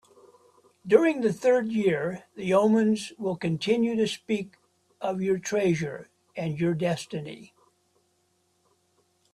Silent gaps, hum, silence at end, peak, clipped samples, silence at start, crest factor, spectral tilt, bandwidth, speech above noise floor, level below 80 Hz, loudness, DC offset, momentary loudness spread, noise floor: none; none; 1.9 s; -4 dBFS; under 0.1%; 0.85 s; 22 dB; -6 dB/octave; 13 kHz; 45 dB; -68 dBFS; -26 LUFS; under 0.1%; 15 LU; -70 dBFS